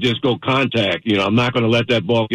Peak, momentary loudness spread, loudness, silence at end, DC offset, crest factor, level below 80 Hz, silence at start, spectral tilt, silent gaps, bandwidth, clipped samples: -6 dBFS; 2 LU; -17 LUFS; 0 s; under 0.1%; 10 dB; -50 dBFS; 0 s; -6.5 dB/octave; none; 10.5 kHz; under 0.1%